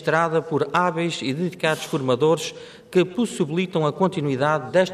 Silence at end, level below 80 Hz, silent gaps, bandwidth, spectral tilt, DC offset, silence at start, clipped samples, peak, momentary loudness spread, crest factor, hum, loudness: 0 s; -66 dBFS; none; 14.5 kHz; -5.5 dB/octave; under 0.1%; 0 s; under 0.1%; -6 dBFS; 5 LU; 16 dB; none; -22 LUFS